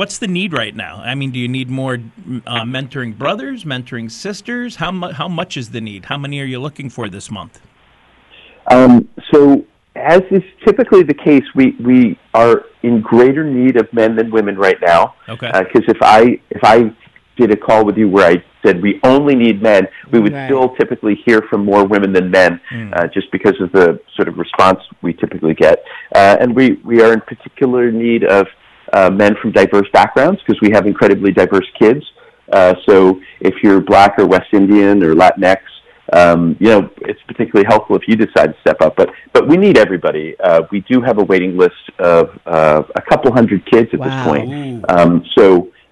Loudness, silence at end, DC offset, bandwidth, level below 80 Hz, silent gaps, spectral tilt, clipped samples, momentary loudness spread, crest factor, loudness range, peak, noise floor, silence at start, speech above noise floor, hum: -11 LUFS; 0.2 s; under 0.1%; 11.5 kHz; -46 dBFS; none; -6.5 dB/octave; under 0.1%; 13 LU; 10 dB; 11 LU; 0 dBFS; -50 dBFS; 0 s; 39 dB; none